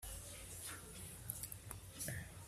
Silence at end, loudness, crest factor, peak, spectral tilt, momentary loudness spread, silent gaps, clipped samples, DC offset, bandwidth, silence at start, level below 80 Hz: 0 s; -48 LUFS; 26 dB; -24 dBFS; -3 dB/octave; 5 LU; none; under 0.1%; under 0.1%; 16 kHz; 0 s; -60 dBFS